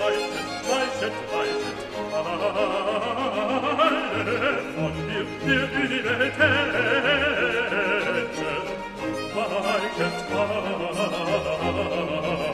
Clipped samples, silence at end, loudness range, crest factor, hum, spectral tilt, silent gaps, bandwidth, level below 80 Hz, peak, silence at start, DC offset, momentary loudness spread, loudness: under 0.1%; 0 s; 4 LU; 18 dB; none; -4.5 dB/octave; none; 14 kHz; -50 dBFS; -6 dBFS; 0 s; under 0.1%; 8 LU; -24 LUFS